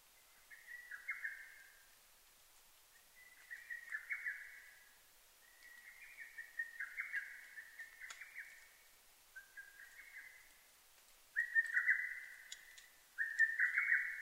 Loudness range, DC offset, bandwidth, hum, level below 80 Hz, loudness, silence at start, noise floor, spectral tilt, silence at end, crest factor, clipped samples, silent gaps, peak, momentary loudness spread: 15 LU; under 0.1%; 16 kHz; none; -82 dBFS; -40 LUFS; 0.35 s; -67 dBFS; 2 dB/octave; 0 s; 24 dB; under 0.1%; none; -22 dBFS; 26 LU